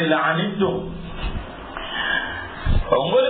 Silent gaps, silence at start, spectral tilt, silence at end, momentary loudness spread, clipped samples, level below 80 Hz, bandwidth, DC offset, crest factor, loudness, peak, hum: none; 0 s; -10 dB/octave; 0 s; 13 LU; under 0.1%; -30 dBFS; 4.5 kHz; under 0.1%; 18 dB; -23 LUFS; -4 dBFS; none